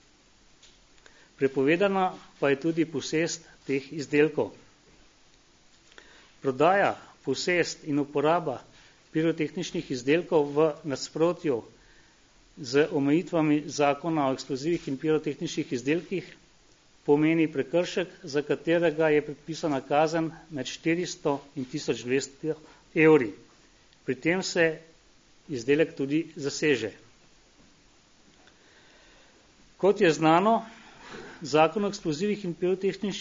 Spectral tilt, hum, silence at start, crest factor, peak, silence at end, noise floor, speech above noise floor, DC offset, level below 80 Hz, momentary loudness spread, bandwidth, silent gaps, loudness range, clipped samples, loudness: -5 dB/octave; none; 1.4 s; 20 dB; -8 dBFS; 0 s; -59 dBFS; 33 dB; under 0.1%; -64 dBFS; 12 LU; 7.6 kHz; none; 4 LU; under 0.1%; -27 LUFS